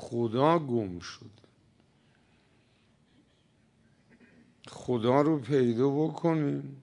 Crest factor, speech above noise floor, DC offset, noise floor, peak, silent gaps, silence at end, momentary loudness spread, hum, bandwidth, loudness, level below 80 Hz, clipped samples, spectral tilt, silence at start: 22 dB; 39 dB; under 0.1%; -66 dBFS; -10 dBFS; none; 0.05 s; 17 LU; none; 10.5 kHz; -28 LUFS; -72 dBFS; under 0.1%; -7.5 dB/octave; 0 s